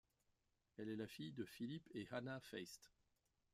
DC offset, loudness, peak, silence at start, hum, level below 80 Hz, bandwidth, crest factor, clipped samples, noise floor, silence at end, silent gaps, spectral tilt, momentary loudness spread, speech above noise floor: under 0.1%; -52 LUFS; -36 dBFS; 0.8 s; none; -84 dBFS; 15.5 kHz; 18 dB; under 0.1%; -86 dBFS; 0.65 s; none; -5.5 dB/octave; 7 LU; 34 dB